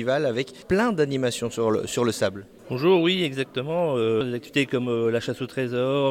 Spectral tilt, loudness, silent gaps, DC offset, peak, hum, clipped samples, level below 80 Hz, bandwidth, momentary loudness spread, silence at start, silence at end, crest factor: -5.5 dB/octave; -24 LUFS; none; under 0.1%; -8 dBFS; none; under 0.1%; -56 dBFS; 16 kHz; 7 LU; 0 s; 0 s; 16 dB